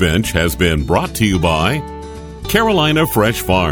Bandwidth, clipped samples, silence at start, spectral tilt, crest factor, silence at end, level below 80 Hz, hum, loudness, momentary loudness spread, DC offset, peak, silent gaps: over 20 kHz; under 0.1%; 0 s; -5 dB/octave; 16 dB; 0 s; -28 dBFS; none; -15 LUFS; 13 LU; under 0.1%; 0 dBFS; none